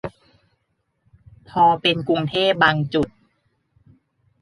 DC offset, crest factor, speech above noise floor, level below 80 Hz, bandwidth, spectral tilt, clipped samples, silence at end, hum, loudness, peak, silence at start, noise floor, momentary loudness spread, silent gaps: under 0.1%; 20 dB; 53 dB; -54 dBFS; 11.5 kHz; -6.5 dB/octave; under 0.1%; 1.35 s; none; -19 LUFS; -2 dBFS; 0.05 s; -72 dBFS; 13 LU; none